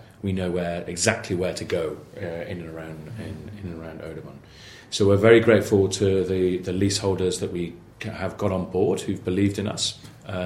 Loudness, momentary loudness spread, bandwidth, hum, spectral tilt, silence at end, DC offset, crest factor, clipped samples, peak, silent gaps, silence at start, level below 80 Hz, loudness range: -23 LUFS; 18 LU; 15 kHz; none; -5 dB/octave; 0 s; under 0.1%; 22 dB; under 0.1%; -2 dBFS; none; 0.25 s; -52 dBFS; 11 LU